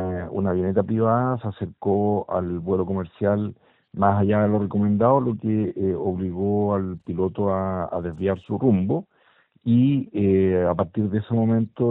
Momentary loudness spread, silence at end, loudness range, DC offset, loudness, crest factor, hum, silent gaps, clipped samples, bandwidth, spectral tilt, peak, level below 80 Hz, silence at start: 8 LU; 0 s; 2 LU; under 0.1%; -23 LUFS; 18 dB; none; none; under 0.1%; 4 kHz; -12 dB/octave; -4 dBFS; -54 dBFS; 0 s